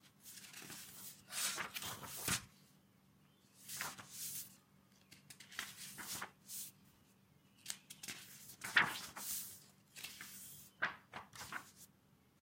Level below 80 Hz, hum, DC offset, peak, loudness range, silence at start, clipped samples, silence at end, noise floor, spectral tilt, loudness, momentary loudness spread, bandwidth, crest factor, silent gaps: -78 dBFS; none; under 0.1%; -16 dBFS; 8 LU; 0.05 s; under 0.1%; 0.55 s; -71 dBFS; -0.5 dB/octave; -44 LUFS; 18 LU; 16.5 kHz; 32 dB; none